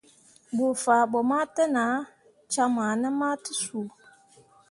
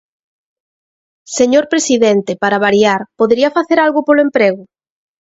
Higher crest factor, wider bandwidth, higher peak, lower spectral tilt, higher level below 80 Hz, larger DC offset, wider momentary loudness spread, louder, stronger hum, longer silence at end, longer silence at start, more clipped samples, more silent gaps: about the same, 18 dB vs 14 dB; first, 11.5 kHz vs 8 kHz; second, -8 dBFS vs 0 dBFS; about the same, -3.5 dB/octave vs -4 dB/octave; second, -74 dBFS vs -56 dBFS; neither; first, 11 LU vs 4 LU; second, -26 LUFS vs -12 LUFS; neither; first, 0.8 s vs 0.55 s; second, 0.5 s vs 1.3 s; neither; neither